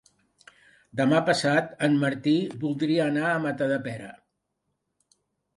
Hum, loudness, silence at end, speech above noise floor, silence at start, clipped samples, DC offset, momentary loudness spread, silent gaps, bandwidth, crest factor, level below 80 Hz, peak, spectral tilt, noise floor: none; -25 LUFS; 1.45 s; 54 dB; 0.95 s; under 0.1%; under 0.1%; 12 LU; none; 11.5 kHz; 18 dB; -70 dBFS; -8 dBFS; -6 dB/octave; -79 dBFS